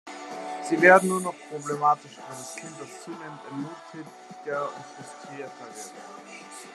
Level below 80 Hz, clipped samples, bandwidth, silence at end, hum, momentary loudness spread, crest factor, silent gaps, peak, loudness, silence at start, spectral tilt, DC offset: -82 dBFS; under 0.1%; 13 kHz; 0 s; none; 23 LU; 26 dB; none; -2 dBFS; -24 LUFS; 0.05 s; -4.5 dB/octave; under 0.1%